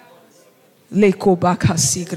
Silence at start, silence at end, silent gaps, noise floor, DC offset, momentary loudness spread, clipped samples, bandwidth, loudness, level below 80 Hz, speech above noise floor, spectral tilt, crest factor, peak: 0.9 s; 0 s; none; -52 dBFS; under 0.1%; 2 LU; under 0.1%; 16 kHz; -16 LUFS; -50 dBFS; 36 dB; -5 dB/octave; 16 dB; -4 dBFS